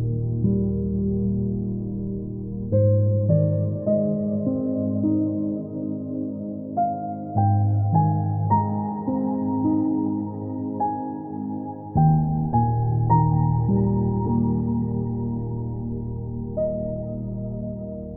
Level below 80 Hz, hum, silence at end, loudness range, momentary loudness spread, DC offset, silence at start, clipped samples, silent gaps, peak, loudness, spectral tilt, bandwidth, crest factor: -42 dBFS; none; 0 s; 4 LU; 10 LU; under 0.1%; 0 s; under 0.1%; none; -6 dBFS; -24 LUFS; -16.5 dB/octave; 2 kHz; 16 dB